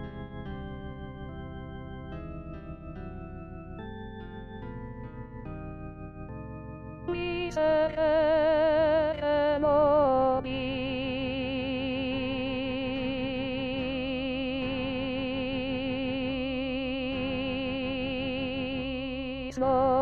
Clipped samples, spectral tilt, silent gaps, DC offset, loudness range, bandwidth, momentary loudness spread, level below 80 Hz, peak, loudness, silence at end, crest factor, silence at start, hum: under 0.1%; -7 dB/octave; none; 0.2%; 17 LU; 7.2 kHz; 18 LU; -46 dBFS; -14 dBFS; -29 LUFS; 0 s; 16 dB; 0 s; none